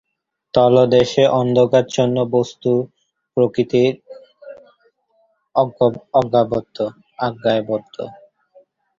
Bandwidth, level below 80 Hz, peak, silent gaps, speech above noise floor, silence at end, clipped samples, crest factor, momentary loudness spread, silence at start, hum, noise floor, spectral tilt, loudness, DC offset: 7.6 kHz; -56 dBFS; -2 dBFS; none; 53 dB; 0.85 s; under 0.1%; 16 dB; 12 LU; 0.55 s; none; -70 dBFS; -6.5 dB/octave; -17 LUFS; under 0.1%